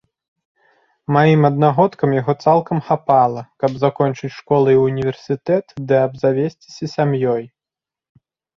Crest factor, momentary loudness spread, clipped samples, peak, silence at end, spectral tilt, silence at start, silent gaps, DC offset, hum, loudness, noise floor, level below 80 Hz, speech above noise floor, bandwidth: 16 dB; 10 LU; under 0.1%; -2 dBFS; 1.1 s; -8.5 dB/octave; 1.1 s; none; under 0.1%; none; -17 LUFS; -88 dBFS; -56 dBFS; 72 dB; 7 kHz